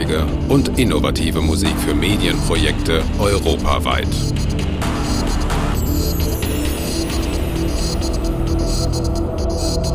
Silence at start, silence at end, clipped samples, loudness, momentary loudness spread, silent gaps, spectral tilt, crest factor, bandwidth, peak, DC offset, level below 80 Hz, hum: 0 s; 0 s; under 0.1%; -19 LUFS; 4 LU; none; -5 dB/octave; 16 dB; 16 kHz; 0 dBFS; under 0.1%; -22 dBFS; none